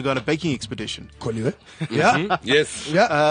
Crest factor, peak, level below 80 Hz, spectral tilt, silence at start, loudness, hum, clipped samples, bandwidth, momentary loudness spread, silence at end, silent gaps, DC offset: 18 dB; -4 dBFS; -52 dBFS; -4.5 dB/octave; 0 s; -22 LUFS; none; under 0.1%; 10 kHz; 12 LU; 0 s; none; under 0.1%